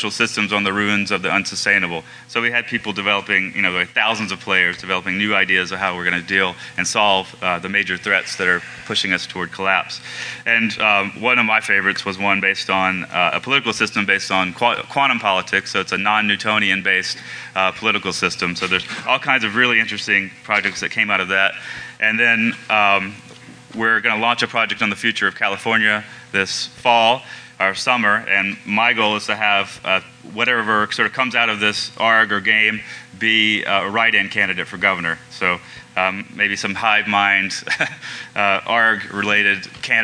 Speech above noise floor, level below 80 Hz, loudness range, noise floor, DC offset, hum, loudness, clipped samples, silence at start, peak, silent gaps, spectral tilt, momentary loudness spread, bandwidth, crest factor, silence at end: 22 dB; -62 dBFS; 2 LU; -41 dBFS; under 0.1%; none; -17 LUFS; under 0.1%; 0 s; 0 dBFS; none; -3 dB/octave; 7 LU; 11 kHz; 18 dB; 0 s